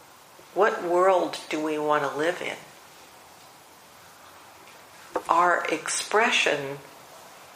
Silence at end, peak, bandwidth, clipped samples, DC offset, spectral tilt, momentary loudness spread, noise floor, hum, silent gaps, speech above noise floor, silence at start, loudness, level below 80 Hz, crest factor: 0 s; -4 dBFS; 15.5 kHz; under 0.1%; under 0.1%; -2.5 dB/octave; 19 LU; -51 dBFS; none; none; 26 dB; 0.55 s; -24 LUFS; -74 dBFS; 24 dB